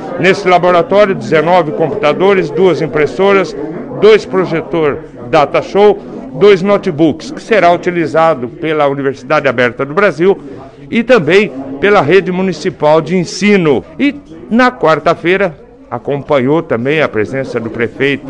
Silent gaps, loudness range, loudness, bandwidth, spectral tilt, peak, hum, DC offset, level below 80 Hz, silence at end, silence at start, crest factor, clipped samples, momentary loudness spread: none; 2 LU; -11 LUFS; 9.6 kHz; -6 dB/octave; 0 dBFS; none; under 0.1%; -44 dBFS; 0 s; 0 s; 10 dB; 0.3%; 9 LU